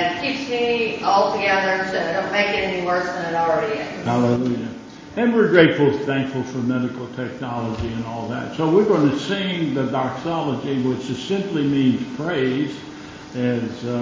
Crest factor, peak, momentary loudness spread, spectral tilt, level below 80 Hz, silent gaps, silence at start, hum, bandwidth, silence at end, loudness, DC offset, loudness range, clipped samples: 20 dB; -2 dBFS; 10 LU; -6 dB/octave; -50 dBFS; none; 0 s; none; 7.6 kHz; 0 s; -21 LUFS; under 0.1%; 3 LU; under 0.1%